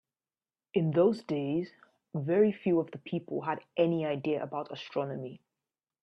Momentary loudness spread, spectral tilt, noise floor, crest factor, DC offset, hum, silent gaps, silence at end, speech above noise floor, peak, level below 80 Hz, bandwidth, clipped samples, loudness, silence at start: 11 LU; -8.5 dB/octave; under -90 dBFS; 18 dB; under 0.1%; none; none; 0.65 s; over 60 dB; -14 dBFS; -74 dBFS; 8.2 kHz; under 0.1%; -31 LUFS; 0.75 s